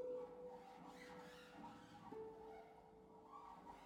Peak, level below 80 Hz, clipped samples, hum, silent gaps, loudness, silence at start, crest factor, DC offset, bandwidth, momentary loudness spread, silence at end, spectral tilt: -42 dBFS; -80 dBFS; under 0.1%; none; none; -58 LUFS; 0 s; 16 dB; under 0.1%; 16.5 kHz; 8 LU; 0 s; -5.5 dB/octave